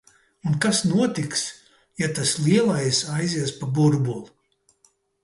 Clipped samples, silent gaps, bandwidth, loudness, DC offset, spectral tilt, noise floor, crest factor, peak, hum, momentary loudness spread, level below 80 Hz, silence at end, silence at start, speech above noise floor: under 0.1%; none; 11.5 kHz; -22 LUFS; under 0.1%; -4.5 dB/octave; -64 dBFS; 16 dB; -6 dBFS; none; 9 LU; -60 dBFS; 0.95 s; 0.45 s; 42 dB